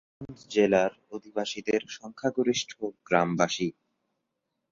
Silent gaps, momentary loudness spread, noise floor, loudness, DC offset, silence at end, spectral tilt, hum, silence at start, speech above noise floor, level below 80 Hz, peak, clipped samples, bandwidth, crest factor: none; 15 LU; -82 dBFS; -28 LUFS; under 0.1%; 1 s; -4.5 dB/octave; none; 0.2 s; 54 dB; -66 dBFS; -6 dBFS; under 0.1%; 7.6 kHz; 22 dB